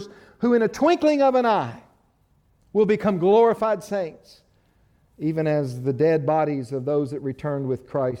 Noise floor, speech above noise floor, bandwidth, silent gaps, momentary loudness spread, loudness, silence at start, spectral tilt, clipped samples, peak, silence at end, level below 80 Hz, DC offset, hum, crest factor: -63 dBFS; 41 dB; 12.5 kHz; none; 10 LU; -22 LUFS; 0 s; -7.5 dB/octave; under 0.1%; -6 dBFS; 0 s; -60 dBFS; under 0.1%; none; 16 dB